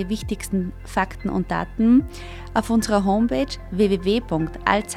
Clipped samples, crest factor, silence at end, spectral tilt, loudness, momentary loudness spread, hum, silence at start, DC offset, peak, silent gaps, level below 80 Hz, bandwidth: under 0.1%; 20 dB; 0 s; -5.5 dB/octave; -22 LUFS; 9 LU; none; 0 s; under 0.1%; -2 dBFS; none; -36 dBFS; 14.5 kHz